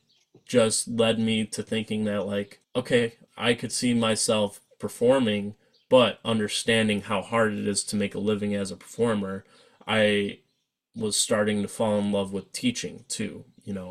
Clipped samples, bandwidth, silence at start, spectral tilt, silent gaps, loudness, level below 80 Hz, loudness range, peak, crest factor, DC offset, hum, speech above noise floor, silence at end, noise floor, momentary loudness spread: under 0.1%; 15 kHz; 0.5 s; -4 dB/octave; none; -25 LUFS; -62 dBFS; 3 LU; -6 dBFS; 20 dB; under 0.1%; none; 50 dB; 0 s; -76 dBFS; 11 LU